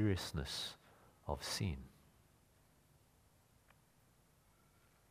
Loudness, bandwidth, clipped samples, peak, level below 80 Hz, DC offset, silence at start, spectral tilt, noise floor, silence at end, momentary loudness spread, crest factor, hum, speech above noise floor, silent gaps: -43 LUFS; 15.5 kHz; under 0.1%; -22 dBFS; -58 dBFS; under 0.1%; 0 s; -4.5 dB/octave; -71 dBFS; 3.2 s; 16 LU; 24 dB; none; 29 dB; none